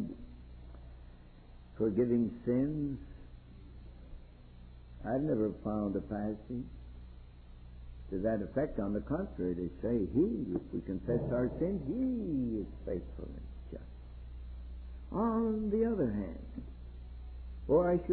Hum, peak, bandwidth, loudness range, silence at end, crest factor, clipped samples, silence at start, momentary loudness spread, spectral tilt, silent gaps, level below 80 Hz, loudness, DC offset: 60 Hz at -55 dBFS; -18 dBFS; 4.3 kHz; 4 LU; 0 s; 18 dB; under 0.1%; 0 s; 23 LU; -9.5 dB/octave; none; -48 dBFS; -35 LUFS; under 0.1%